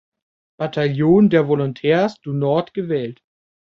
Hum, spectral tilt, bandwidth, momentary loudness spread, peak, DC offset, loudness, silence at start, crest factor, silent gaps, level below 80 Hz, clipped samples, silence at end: none; -8.5 dB/octave; 6.8 kHz; 11 LU; -2 dBFS; under 0.1%; -18 LUFS; 0.6 s; 16 dB; none; -58 dBFS; under 0.1%; 0.5 s